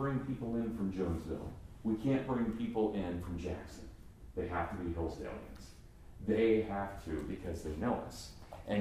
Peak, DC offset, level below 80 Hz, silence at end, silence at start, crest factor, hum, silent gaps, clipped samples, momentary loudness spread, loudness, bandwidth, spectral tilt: -20 dBFS; under 0.1%; -52 dBFS; 0 s; 0 s; 18 dB; none; none; under 0.1%; 16 LU; -37 LUFS; 15 kHz; -7.5 dB/octave